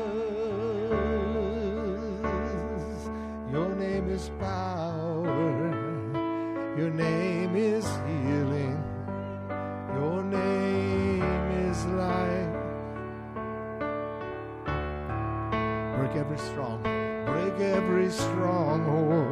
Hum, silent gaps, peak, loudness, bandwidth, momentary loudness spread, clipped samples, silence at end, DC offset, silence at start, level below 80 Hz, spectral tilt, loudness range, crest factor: none; none; -14 dBFS; -30 LUFS; 13 kHz; 9 LU; under 0.1%; 0 s; under 0.1%; 0 s; -44 dBFS; -7 dB/octave; 4 LU; 14 dB